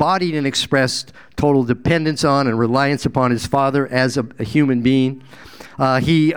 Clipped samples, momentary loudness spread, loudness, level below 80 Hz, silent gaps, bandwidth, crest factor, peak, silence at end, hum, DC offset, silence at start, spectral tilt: under 0.1%; 6 LU; -17 LUFS; -44 dBFS; none; 17.5 kHz; 16 dB; 0 dBFS; 0 s; none; 0.5%; 0 s; -5.5 dB/octave